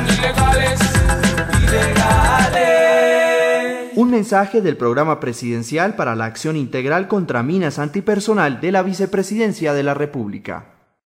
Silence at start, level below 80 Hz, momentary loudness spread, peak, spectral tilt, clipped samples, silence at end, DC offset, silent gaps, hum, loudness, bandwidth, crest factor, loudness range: 0 s; -28 dBFS; 9 LU; -2 dBFS; -5 dB/octave; under 0.1%; 0.4 s; under 0.1%; none; none; -16 LUFS; 16 kHz; 14 dB; 5 LU